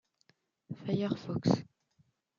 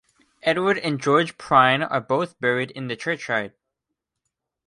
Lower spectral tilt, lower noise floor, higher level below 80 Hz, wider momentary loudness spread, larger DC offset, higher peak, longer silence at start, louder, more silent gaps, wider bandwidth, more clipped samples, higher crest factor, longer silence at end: first, -7.5 dB/octave vs -5 dB/octave; second, -73 dBFS vs -82 dBFS; second, -72 dBFS vs -64 dBFS; about the same, 12 LU vs 10 LU; neither; second, -12 dBFS vs -4 dBFS; first, 0.7 s vs 0.45 s; second, -34 LUFS vs -22 LUFS; neither; second, 7.4 kHz vs 11.5 kHz; neither; about the same, 24 dB vs 20 dB; second, 0.75 s vs 1.2 s